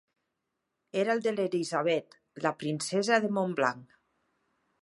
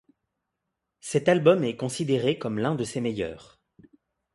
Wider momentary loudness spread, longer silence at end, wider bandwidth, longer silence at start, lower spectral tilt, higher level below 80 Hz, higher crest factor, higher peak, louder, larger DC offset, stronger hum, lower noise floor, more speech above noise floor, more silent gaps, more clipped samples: second, 7 LU vs 13 LU; about the same, 1 s vs 0.95 s; about the same, 11.5 kHz vs 11.5 kHz; about the same, 0.95 s vs 1.05 s; about the same, -4.5 dB/octave vs -5.5 dB/octave; second, -80 dBFS vs -62 dBFS; about the same, 20 dB vs 22 dB; second, -10 dBFS vs -6 dBFS; second, -30 LUFS vs -25 LUFS; neither; neither; about the same, -83 dBFS vs -83 dBFS; second, 54 dB vs 58 dB; neither; neither